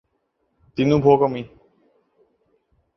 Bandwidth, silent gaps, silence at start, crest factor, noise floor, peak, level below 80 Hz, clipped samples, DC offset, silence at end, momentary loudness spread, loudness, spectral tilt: 6.2 kHz; none; 0.75 s; 20 dB; -71 dBFS; -2 dBFS; -52 dBFS; under 0.1%; under 0.1%; 1.5 s; 18 LU; -18 LUFS; -8.5 dB/octave